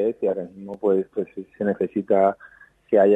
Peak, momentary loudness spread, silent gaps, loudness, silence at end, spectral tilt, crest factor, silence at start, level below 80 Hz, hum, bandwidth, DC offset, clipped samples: -6 dBFS; 12 LU; none; -23 LUFS; 0 s; -9.5 dB/octave; 16 dB; 0 s; -68 dBFS; none; 7.8 kHz; under 0.1%; under 0.1%